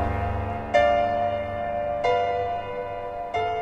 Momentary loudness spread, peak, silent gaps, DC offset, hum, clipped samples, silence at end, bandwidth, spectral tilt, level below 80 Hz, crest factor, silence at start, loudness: 10 LU; -8 dBFS; none; under 0.1%; none; under 0.1%; 0 s; 8.2 kHz; -6.5 dB/octave; -40 dBFS; 18 dB; 0 s; -25 LUFS